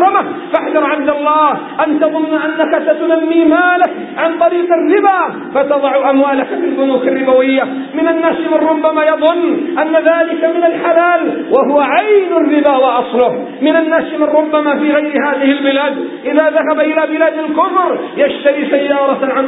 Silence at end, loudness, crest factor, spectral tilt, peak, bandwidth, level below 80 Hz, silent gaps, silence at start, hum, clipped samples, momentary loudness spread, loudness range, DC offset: 0 s; -12 LUFS; 12 dB; -8.5 dB/octave; 0 dBFS; 4 kHz; -62 dBFS; none; 0 s; none; under 0.1%; 5 LU; 2 LU; under 0.1%